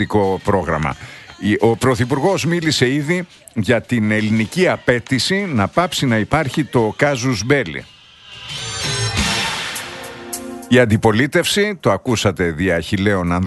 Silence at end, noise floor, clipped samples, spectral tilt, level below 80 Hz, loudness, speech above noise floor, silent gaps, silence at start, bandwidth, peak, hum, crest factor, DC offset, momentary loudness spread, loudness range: 0 s; -39 dBFS; under 0.1%; -5 dB/octave; -40 dBFS; -17 LUFS; 23 dB; none; 0 s; 12.5 kHz; 0 dBFS; none; 18 dB; under 0.1%; 12 LU; 3 LU